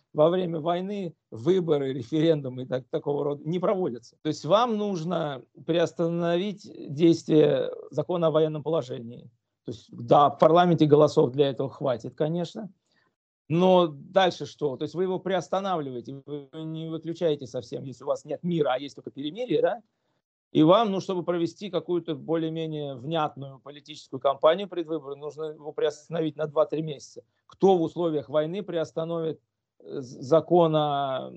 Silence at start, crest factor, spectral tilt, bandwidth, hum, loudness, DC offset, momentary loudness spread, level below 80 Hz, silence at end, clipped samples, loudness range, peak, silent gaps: 0.15 s; 22 dB; -7 dB/octave; 8.2 kHz; none; -26 LUFS; under 0.1%; 17 LU; -74 dBFS; 0 s; under 0.1%; 7 LU; -4 dBFS; 13.16-13.45 s, 20.24-20.51 s